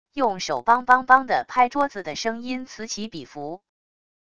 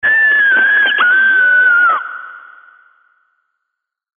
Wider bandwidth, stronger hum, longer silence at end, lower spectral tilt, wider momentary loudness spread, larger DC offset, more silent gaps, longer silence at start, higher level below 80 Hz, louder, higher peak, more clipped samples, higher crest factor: first, 9.8 kHz vs 3.8 kHz; neither; second, 0.75 s vs 1.8 s; about the same, -3 dB/octave vs -3.5 dB/octave; first, 18 LU vs 10 LU; first, 0.4% vs under 0.1%; neither; about the same, 0.15 s vs 0.05 s; about the same, -60 dBFS vs -64 dBFS; second, -22 LUFS vs -9 LUFS; about the same, -2 dBFS vs -2 dBFS; neither; first, 22 dB vs 12 dB